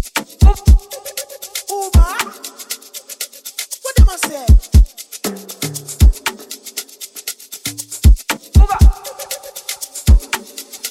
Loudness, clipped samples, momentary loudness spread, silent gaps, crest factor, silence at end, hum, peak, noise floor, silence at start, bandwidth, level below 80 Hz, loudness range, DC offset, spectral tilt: -17 LUFS; under 0.1%; 14 LU; none; 14 dB; 0 s; none; 0 dBFS; -31 dBFS; 0 s; 16 kHz; -16 dBFS; 3 LU; under 0.1%; -4.5 dB/octave